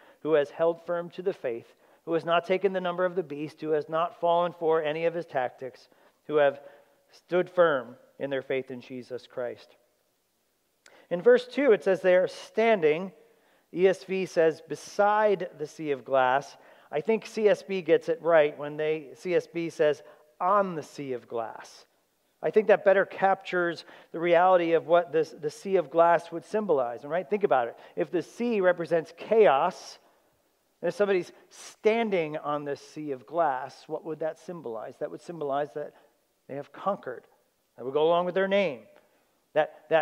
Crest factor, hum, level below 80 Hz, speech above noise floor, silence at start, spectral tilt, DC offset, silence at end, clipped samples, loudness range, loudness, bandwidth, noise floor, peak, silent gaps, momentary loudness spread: 20 dB; none; -88 dBFS; 46 dB; 0.25 s; -5.5 dB/octave; under 0.1%; 0 s; under 0.1%; 7 LU; -27 LUFS; 12 kHz; -73 dBFS; -8 dBFS; none; 15 LU